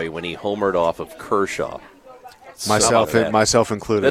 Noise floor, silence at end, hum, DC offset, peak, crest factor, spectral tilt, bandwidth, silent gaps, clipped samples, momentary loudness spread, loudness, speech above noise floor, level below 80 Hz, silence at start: -43 dBFS; 0 s; none; under 0.1%; -2 dBFS; 18 dB; -3.5 dB/octave; 16.5 kHz; none; under 0.1%; 13 LU; -19 LUFS; 24 dB; -48 dBFS; 0 s